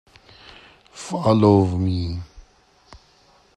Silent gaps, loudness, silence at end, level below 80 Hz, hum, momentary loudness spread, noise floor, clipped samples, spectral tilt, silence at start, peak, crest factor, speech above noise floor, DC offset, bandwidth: none; -19 LUFS; 1.15 s; -50 dBFS; none; 21 LU; -56 dBFS; under 0.1%; -8 dB/octave; 0.95 s; -2 dBFS; 20 dB; 38 dB; under 0.1%; 10.5 kHz